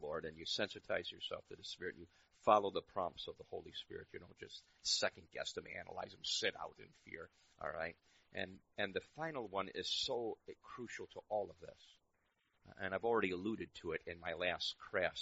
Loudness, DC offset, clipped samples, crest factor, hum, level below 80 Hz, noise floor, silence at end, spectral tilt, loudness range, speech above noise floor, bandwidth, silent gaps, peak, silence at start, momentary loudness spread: -42 LUFS; under 0.1%; under 0.1%; 26 dB; none; -74 dBFS; -81 dBFS; 0 s; -1 dB/octave; 5 LU; 38 dB; 8 kHz; none; -16 dBFS; 0 s; 16 LU